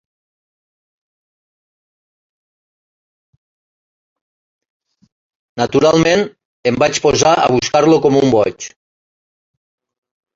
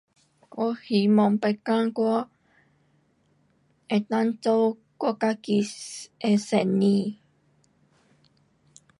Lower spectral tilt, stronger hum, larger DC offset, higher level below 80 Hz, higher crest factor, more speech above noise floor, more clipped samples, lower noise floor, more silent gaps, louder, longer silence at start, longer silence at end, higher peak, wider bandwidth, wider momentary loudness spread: second, -4.5 dB/octave vs -6.5 dB/octave; neither; neither; first, -50 dBFS vs -74 dBFS; about the same, 18 dB vs 18 dB; first, over 77 dB vs 42 dB; neither; first, under -90 dBFS vs -66 dBFS; first, 6.45-6.63 s vs none; first, -13 LUFS vs -25 LUFS; first, 5.55 s vs 0.55 s; second, 1.65 s vs 1.85 s; first, 0 dBFS vs -8 dBFS; second, 8 kHz vs 11.5 kHz; about the same, 12 LU vs 10 LU